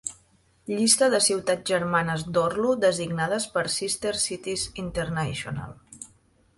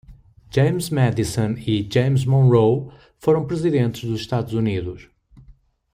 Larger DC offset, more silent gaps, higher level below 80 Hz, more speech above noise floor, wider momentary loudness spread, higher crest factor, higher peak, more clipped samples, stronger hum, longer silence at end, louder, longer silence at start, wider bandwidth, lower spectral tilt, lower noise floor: neither; neither; second, -54 dBFS vs -48 dBFS; first, 37 dB vs 32 dB; first, 17 LU vs 10 LU; first, 22 dB vs 16 dB; about the same, -4 dBFS vs -4 dBFS; neither; neither; about the same, 0.5 s vs 0.4 s; second, -25 LUFS vs -20 LUFS; about the same, 0.05 s vs 0.1 s; second, 12 kHz vs 15.5 kHz; second, -3 dB/octave vs -7 dB/octave; first, -62 dBFS vs -51 dBFS